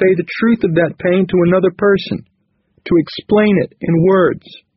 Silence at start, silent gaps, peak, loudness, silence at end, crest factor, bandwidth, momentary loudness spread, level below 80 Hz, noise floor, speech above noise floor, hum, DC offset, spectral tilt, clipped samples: 0 s; none; -2 dBFS; -14 LUFS; 0.25 s; 12 dB; 5.8 kHz; 5 LU; -48 dBFS; -60 dBFS; 46 dB; none; under 0.1%; -6 dB/octave; under 0.1%